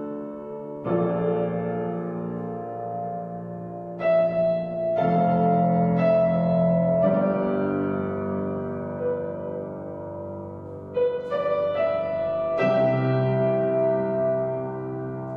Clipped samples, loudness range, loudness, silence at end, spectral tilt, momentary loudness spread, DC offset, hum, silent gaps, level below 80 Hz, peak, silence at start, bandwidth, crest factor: under 0.1%; 7 LU; -25 LUFS; 0 s; -10.5 dB/octave; 14 LU; under 0.1%; none; none; -60 dBFS; -10 dBFS; 0 s; 5 kHz; 14 dB